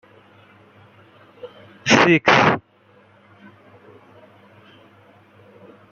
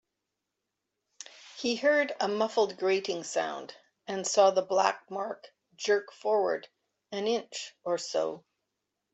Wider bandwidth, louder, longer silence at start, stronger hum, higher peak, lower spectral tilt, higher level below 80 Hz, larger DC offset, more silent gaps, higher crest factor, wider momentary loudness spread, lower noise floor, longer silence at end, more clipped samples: about the same, 7.8 kHz vs 8.2 kHz; first, -15 LUFS vs -29 LUFS; about the same, 1.45 s vs 1.4 s; neither; first, 0 dBFS vs -10 dBFS; first, -4.5 dB/octave vs -2.5 dB/octave; first, -60 dBFS vs -80 dBFS; neither; neither; about the same, 22 dB vs 20 dB; first, 28 LU vs 19 LU; second, -54 dBFS vs -85 dBFS; first, 3.35 s vs 0.75 s; neither